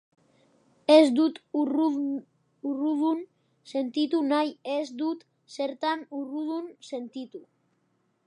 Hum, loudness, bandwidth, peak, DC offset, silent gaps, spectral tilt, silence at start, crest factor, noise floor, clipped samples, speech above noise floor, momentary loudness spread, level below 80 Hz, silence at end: none; -27 LUFS; 11 kHz; -6 dBFS; under 0.1%; none; -4 dB/octave; 0.9 s; 22 dB; -72 dBFS; under 0.1%; 46 dB; 18 LU; -86 dBFS; 0.85 s